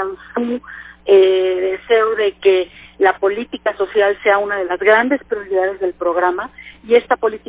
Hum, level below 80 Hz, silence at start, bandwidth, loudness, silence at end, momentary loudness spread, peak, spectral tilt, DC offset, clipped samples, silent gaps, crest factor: none; -52 dBFS; 0 s; 4 kHz; -16 LUFS; 0.1 s; 11 LU; -2 dBFS; -7.5 dB/octave; under 0.1%; under 0.1%; none; 14 dB